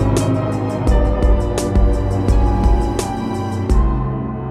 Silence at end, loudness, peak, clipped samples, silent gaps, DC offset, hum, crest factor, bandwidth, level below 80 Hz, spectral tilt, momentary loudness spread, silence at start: 0 s; -18 LUFS; -2 dBFS; under 0.1%; none; under 0.1%; none; 12 dB; 12 kHz; -18 dBFS; -7 dB/octave; 6 LU; 0 s